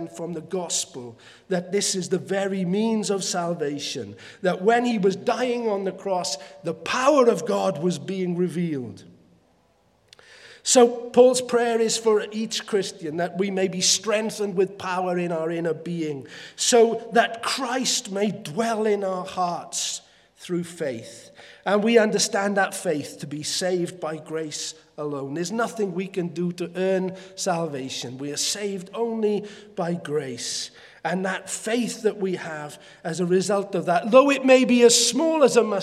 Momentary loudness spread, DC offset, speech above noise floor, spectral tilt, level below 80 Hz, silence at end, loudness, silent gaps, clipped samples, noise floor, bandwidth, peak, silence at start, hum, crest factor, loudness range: 14 LU; under 0.1%; 39 dB; -3.5 dB/octave; -74 dBFS; 0 s; -23 LUFS; none; under 0.1%; -62 dBFS; 15 kHz; -2 dBFS; 0 s; none; 22 dB; 7 LU